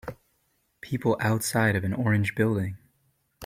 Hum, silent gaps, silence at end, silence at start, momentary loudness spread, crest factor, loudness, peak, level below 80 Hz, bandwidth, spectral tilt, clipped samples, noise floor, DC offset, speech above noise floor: none; none; 0 s; 0.05 s; 16 LU; 20 dB; -26 LUFS; -8 dBFS; -58 dBFS; 16 kHz; -6 dB/octave; under 0.1%; -71 dBFS; under 0.1%; 46 dB